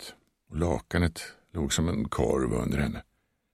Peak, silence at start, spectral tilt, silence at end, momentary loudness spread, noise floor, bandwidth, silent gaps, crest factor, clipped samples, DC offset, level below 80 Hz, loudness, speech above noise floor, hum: -12 dBFS; 0 s; -5.5 dB/octave; 0.5 s; 13 LU; -49 dBFS; 15 kHz; none; 18 dB; under 0.1%; under 0.1%; -40 dBFS; -29 LUFS; 21 dB; none